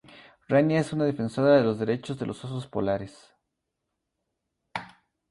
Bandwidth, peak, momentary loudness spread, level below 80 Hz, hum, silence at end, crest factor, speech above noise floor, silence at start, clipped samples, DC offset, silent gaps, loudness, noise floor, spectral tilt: 11.5 kHz; -8 dBFS; 17 LU; -62 dBFS; none; 0.4 s; 20 dB; 57 dB; 0.15 s; under 0.1%; under 0.1%; none; -26 LUFS; -82 dBFS; -7.5 dB/octave